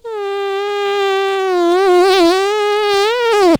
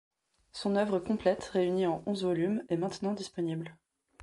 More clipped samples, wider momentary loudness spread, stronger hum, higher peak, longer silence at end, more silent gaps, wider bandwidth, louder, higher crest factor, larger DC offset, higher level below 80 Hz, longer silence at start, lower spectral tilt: neither; about the same, 8 LU vs 7 LU; neither; first, -2 dBFS vs -14 dBFS; about the same, 0 s vs 0 s; neither; first, over 20 kHz vs 11.5 kHz; first, -14 LUFS vs -32 LUFS; second, 10 dB vs 20 dB; neither; first, -52 dBFS vs -66 dBFS; second, 0.05 s vs 0.55 s; second, -3.5 dB/octave vs -6.5 dB/octave